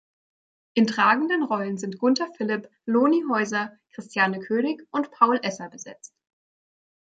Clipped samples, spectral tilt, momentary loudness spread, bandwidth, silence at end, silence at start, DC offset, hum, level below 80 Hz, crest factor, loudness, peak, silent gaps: under 0.1%; -5 dB/octave; 13 LU; 9 kHz; 1.15 s; 0.75 s; under 0.1%; none; -76 dBFS; 22 dB; -24 LUFS; -4 dBFS; none